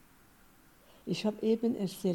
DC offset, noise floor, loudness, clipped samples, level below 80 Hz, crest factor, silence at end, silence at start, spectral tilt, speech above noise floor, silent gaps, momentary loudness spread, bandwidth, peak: under 0.1%; -61 dBFS; -33 LUFS; under 0.1%; -68 dBFS; 16 dB; 0 s; 1.05 s; -6.5 dB/octave; 30 dB; none; 8 LU; 18 kHz; -18 dBFS